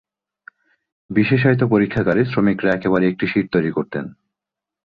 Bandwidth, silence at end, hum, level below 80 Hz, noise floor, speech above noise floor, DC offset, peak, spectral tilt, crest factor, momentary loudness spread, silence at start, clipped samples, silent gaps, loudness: 5.2 kHz; 0.75 s; none; -50 dBFS; -86 dBFS; 69 dB; under 0.1%; -2 dBFS; -9.5 dB/octave; 16 dB; 9 LU; 1.1 s; under 0.1%; none; -18 LUFS